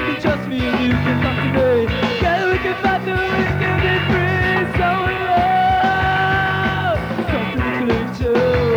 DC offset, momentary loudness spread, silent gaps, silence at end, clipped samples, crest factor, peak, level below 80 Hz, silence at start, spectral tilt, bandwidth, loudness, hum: under 0.1%; 4 LU; none; 0 s; under 0.1%; 14 dB; -4 dBFS; -32 dBFS; 0 s; -7 dB/octave; over 20 kHz; -17 LUFS; none